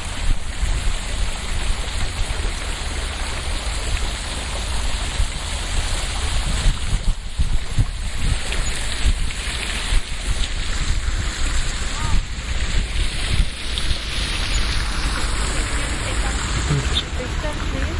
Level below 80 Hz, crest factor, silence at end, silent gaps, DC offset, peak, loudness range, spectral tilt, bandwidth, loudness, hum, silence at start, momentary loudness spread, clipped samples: -22 dBFS; 16 dB; 0 s; none; under 0.1%; -4 dBFS; 3 LU; -3 dB/octave; 11.5 kHz; -24 LUFS; none; 0 s; 4 LU; under 0.1%